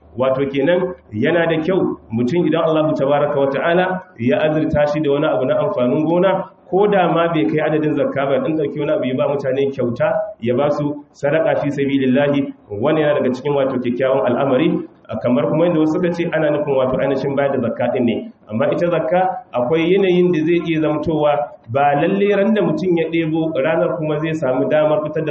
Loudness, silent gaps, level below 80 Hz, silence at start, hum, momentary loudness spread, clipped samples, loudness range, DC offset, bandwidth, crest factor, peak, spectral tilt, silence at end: -17 LUFS; none; -52 dBFS; 0.15 s; none; 5 LU; under 0.1%; 2 LU; under 0.1%; 7.2 kHz; 12 dB; -4 dBFS; -6 dB/octave; 0 s